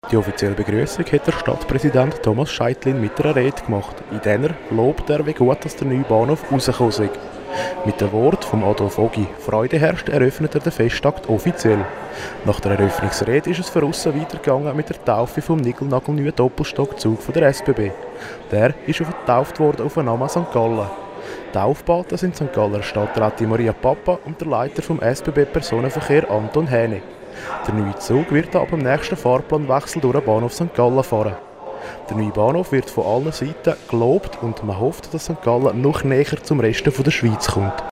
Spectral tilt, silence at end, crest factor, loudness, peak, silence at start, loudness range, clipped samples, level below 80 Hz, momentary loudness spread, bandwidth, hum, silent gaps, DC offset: -6.5 dB/octave; 0 s; 16 dB; -19 LUFS; -4 dBFS; 0.05 s; 2 LU; under 0.1%; -42 dBFS; 7 LU; 16 kHz; none; none; under 0.1%